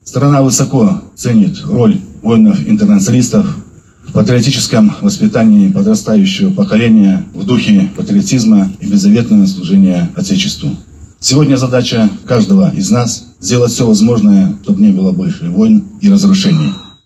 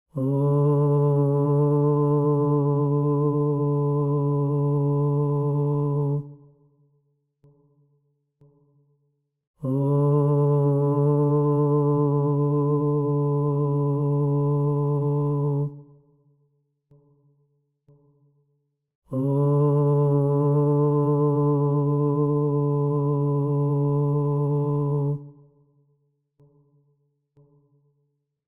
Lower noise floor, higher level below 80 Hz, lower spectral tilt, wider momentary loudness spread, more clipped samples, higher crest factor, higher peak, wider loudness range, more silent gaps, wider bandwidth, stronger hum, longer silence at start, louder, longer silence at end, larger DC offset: second, -32 dBFS vs -73 dBFS; first, -40 dBFS vs -58 dBFS; second, -6 dB/octave vs -13 dB/octave; about the same, 6 LU vs 4 LU; neither; about the same, 10 dB vs 12 dB; first, 0 dBFS vs -10 dBFS; second, 2 LU vs 10 LU; second, none vs 9.47-9.54 s, 18.95-19.02 s; first, 12.5 kHz vs 1.5 kHz; neither; about the same, 0.05 s vs 0.15 s; first, -10 LUFS vs -22 LUFS; second, 0.2 s vs 3.15 s; neither